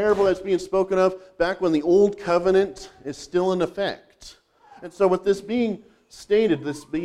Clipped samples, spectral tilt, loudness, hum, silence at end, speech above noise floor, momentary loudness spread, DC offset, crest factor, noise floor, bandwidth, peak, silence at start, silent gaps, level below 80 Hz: under 0.1%; -6 dB/octave; -22 LUFS; none; 0 s; 30 dB; 16 LU; under 0.1%; 16 dB; -52 dBFS; 11 kHz; -8 dBFS; 0 s; none; -52 dBFS